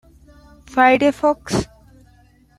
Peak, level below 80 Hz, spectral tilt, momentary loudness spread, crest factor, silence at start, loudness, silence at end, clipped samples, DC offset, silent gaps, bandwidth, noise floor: -2 dBFS; -46 dBFS; -5 dB/octave; 11 LU; 18 dB; 0.7 s; -17 LUFS; 0.95 s; under 0.1%; under 0.1%; none; 14.5 kHz; -52 dBFS